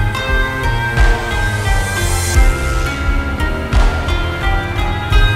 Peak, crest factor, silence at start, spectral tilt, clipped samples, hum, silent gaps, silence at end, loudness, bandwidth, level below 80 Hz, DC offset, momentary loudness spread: 0 dBFS; 14 dB; 0 s; -4.5 dB/octave; under 0.1%; none; none; 0 s; -16 LUFS; 15.5 kHz; -16 dBFS; under 0.1%; 4 LU